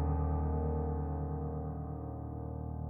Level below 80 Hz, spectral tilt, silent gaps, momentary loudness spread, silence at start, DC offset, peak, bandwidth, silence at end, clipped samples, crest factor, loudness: -40 dBFS; -14 dB/octave; none; 8 LU; 0 s; under 0.1%; -22 dBFS; 2.2 kHz; 0 s; under 0.1%; 12 dB; -37 LUFS